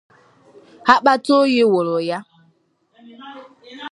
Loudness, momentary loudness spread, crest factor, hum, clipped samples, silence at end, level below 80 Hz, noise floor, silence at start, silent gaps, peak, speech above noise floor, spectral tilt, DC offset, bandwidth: -16 LUFS; 24 LU; 20 dB; none; under 0.1%; 0.05 s; -66 dBFS; -61 dBFS; 0.85 s; none; 0 dBFS; 46 dB; -5 dB/octave; under 0.1%; 11.5 kHz